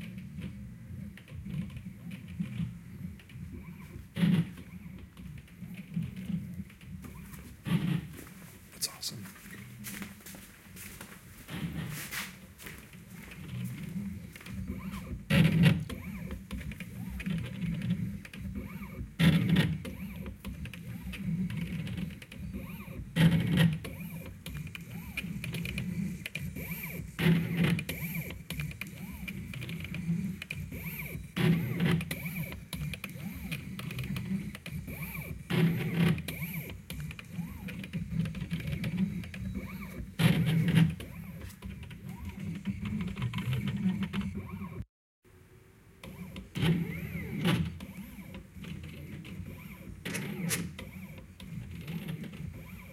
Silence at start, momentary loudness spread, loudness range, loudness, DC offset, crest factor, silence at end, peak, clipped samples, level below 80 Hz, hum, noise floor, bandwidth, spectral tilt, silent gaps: 0 s; 18 LU; 9 LU; -34 LUFS; under 0.1%; 22 dB; 0 s; -12 dBFS; under 0.1%; -52 dBFS; none; -57 dBFS; 16.5 kHz; -6 dB/octave; 44.89-45.22 s